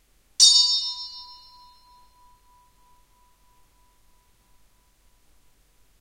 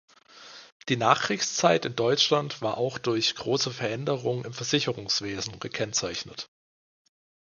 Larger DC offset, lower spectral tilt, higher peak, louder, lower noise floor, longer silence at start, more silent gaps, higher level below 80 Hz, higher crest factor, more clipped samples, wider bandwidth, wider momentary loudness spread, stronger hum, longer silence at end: neither; second, 5 dB/octave vs -3.5 dB/octave; about the same, -2 dBFS vs -4 dBFS; first, -16 LUFS vs -26 LUFS; first, -60 dBFS vs -49 dBFS; about the same, 0.4 s vs 0.35 s; second, none vs 0.72-0.80 s; about the same, -64 dBFS vs -64 dBFS; about the same, 26 dB vs 24 dB; neither; first, 16 kHz vs 10 kHz; first, 27 LU vs 15 LU; neither; first, 4.8 s vs 1.05 s